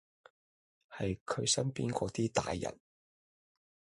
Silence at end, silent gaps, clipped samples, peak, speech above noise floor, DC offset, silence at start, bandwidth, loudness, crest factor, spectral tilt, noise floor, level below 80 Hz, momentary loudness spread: 1.25 s; 1.21-1.26 s; under 0.1%; -16 dBFS; over 55 dB; under 0.1%; 0.9 s; 11.5 kHz; -35 LUFS; 22 dB; -4 dB/octave; under -90 dBFS; -60 dBFS; 9 LU